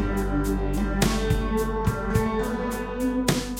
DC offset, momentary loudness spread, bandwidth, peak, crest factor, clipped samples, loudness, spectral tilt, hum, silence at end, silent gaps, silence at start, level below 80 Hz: under 0.1%; 4 LU; 17 kHz; -6 dBFS; 18 dB; under 0.1%; -26 LUFS; -5.5 dB/octave; none; 0 s; none; 0 s; -30 dBFS